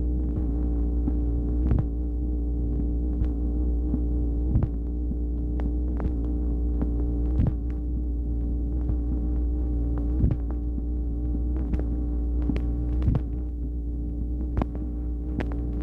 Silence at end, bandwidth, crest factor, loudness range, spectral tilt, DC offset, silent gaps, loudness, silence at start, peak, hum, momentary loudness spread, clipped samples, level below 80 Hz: 0 s; 2.8 kHz; 14 dB; 1 LU; -11.5 dB/octave; under 0.1%; none; -28 LUFS; 0 s; -10 dBFS; none; 5 LU; under 0.1%; -26 dBFS